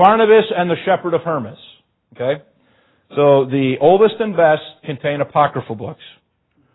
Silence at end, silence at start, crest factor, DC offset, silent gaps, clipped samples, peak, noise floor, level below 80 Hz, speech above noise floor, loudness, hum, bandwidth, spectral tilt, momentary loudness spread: 0.8 s; 0 s; 16 dB; under 0.1%; none; under 0.1%; 0 dBFS; -62 dBFS; -60 dBFS; 47 dB; -16 LUFS; none; 4.1 kHz; -10 dB/octave; 14 LU